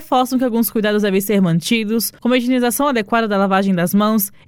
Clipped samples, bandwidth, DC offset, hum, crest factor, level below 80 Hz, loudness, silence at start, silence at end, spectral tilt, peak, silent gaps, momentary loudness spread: under 0.1%; 17.5 kHz; under 0.1%; none; 14 dB; -54 dBFS; -16 LUFS; 0 s; 0.2 s; -5 dB/octave; -2 dBFS; none; 2 LU